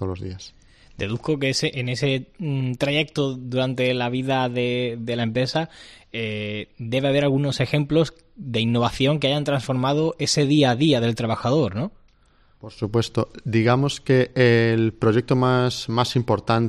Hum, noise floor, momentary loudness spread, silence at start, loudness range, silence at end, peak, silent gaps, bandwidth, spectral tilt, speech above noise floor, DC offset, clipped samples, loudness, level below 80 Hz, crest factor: none; -57 dBFS; 10 LU; 0 s; 4 LU; 0 s; -6 dBFS; none; 12.5 kHz; -6 dB/octave; 35 dB; under 0.1%; under 0.1%; -22 LUFS; -50 dBFS; 16 dB